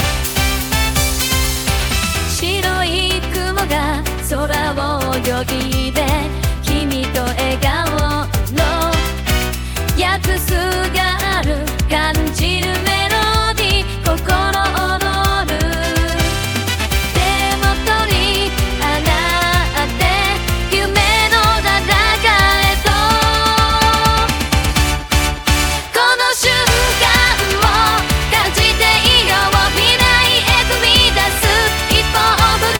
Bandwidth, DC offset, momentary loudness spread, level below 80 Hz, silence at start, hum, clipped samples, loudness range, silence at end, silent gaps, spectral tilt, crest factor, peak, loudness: 19.5 kHz; under 0.1%; 7 LU; -22 dBFS; 0 s; none; under 0.1%; 6 LU; 0 s; none; -3 dB/octave; 14 dB; 0 dBFS; -14 LUFS